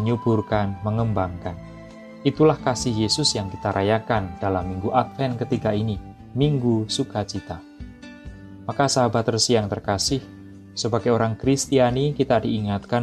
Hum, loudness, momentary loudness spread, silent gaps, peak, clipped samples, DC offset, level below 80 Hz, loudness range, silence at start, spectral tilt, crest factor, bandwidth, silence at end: none; -22 LUFS; 18 LU; none; -6 dBFS; under 0.1%; under 0.1%; -46 dBFS; 3 LU; 0 s; -5 dB/octave; 18 dB; 13 kHz; 0 s